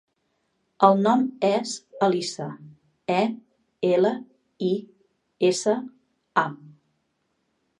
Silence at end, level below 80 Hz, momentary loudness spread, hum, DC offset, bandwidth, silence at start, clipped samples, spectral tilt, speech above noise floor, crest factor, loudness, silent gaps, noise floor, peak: 1.1 s; -78 dBFS; 16 LU; none; under 0.1%; 11 kHz; 0.8 s; under 0.1%; -5 dB/octave; 51 dB; 24 dB; -24 LUFS; none; -73 dBFS; -2 dBFS